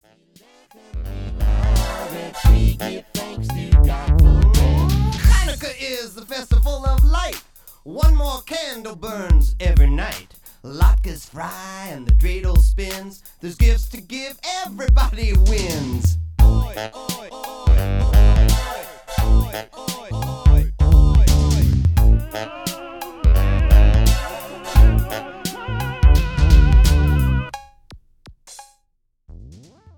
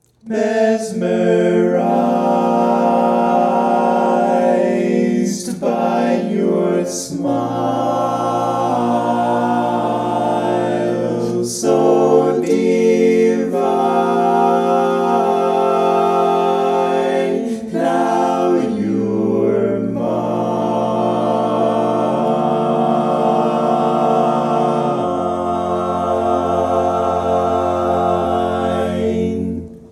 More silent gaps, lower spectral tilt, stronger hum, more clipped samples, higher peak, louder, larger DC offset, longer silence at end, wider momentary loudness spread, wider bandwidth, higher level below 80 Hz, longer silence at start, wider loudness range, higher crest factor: neither; about the same, -6 dB/octave vs -6.5 dB/octave; neither; neither; about the same, 0 dBFS vs 0 dBFS; about the same, -18 LUFS vs -16 LUFS; neither; first, 0.55 s vs 0.05 s; first, 15 LU vs 5 LU; first, 17.5 kHz vs 13.5 kHz; first, -16 dBFS vs -50 dBFS; first, 0.95 s vs 0.25 s; about the same, 4 LU vs 3 LU; about the same, 16 dB vs 16 dB